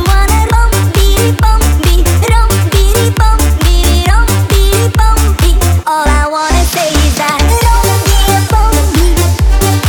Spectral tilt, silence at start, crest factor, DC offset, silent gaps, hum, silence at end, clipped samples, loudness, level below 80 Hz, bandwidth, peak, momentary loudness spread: -4.5 dB/octave; 0 s; 8 dB; under 0.1%; none; none; 0 s; under 0.1%; -10 LUFS; -10 dBFS; over 20 kHz; 0 dBFS; 1 LU